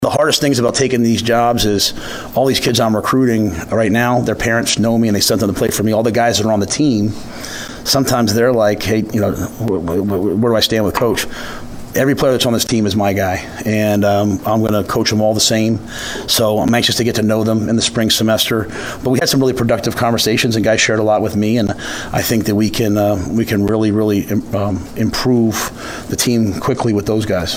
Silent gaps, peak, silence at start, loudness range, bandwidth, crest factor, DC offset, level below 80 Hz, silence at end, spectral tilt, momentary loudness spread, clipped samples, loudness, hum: none; 0 dBFS; 0 s; 2 LU; 16.5 kHz; 14 dB; under 0.1%; -38 dBFS; 0 s; -4.5 dB/octave; 7 LU; under 0.1%; -15 LUFS; none